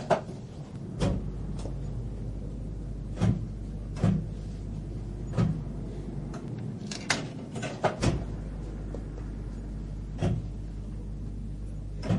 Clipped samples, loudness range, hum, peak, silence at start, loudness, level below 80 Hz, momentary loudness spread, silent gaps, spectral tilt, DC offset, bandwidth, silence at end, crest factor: under 0.1%; 4 LU; none; -8 dBFS; 0 s; -34 LUFS; -38 dBFS; 10 LU; none; -6 dB/octave; under 0.1%; 11.5 kHz; 0 s; 24 dB